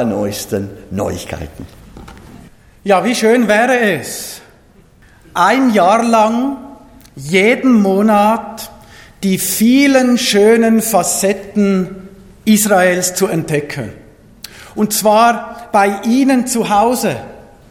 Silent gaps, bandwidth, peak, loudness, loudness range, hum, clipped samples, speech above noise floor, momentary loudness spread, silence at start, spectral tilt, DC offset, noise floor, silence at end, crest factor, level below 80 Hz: none; 18 kHz; 0 dBFS; -13 LUFS; 3 LU; none; under 0.1%; 33 dB; 16 LU; 0 s; -4 dB/octave; under 0.1%; -46 dBFS; 0.3 s; 14 dB; -46 dBFS